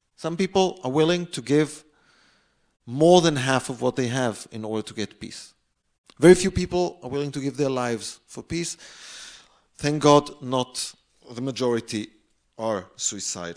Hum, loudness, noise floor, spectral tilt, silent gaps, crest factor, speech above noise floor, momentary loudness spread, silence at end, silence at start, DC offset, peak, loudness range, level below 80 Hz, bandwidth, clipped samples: none; -23 LUFS; -64 dBFS; -5 dB/octave; 5.98-6.04 s; 22 dB; 41 dB; 21 LU; 0 s; 0.2 s; under 0.1%; -2 dBFS; 5 LU; -52 dBFS; 10.5 kHz; under 0.1%